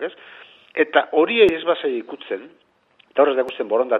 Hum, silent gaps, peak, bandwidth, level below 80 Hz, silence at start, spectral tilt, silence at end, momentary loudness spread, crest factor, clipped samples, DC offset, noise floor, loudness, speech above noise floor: none; none; -2 dBFS; 4.7 kHz; -62 dBFS; 0 s; -5.5 dB/octave; 0 s; 15 LU; 20 dB; under 0.1%; under 0.1%; -58 dBFS; -20 LUFS; 39 dB